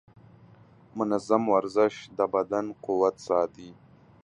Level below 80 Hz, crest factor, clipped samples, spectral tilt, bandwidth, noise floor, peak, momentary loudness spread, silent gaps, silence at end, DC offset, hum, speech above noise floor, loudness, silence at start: -68 dBFS; 20 dB; under 0.1%; -6 dB/octave; 10.5 kHz; -55 dBFS; -8 dBFS; 8 LU; none; 0.5 s; under 0.1%; none; 28 dB; -27 LUFS; 0.95 s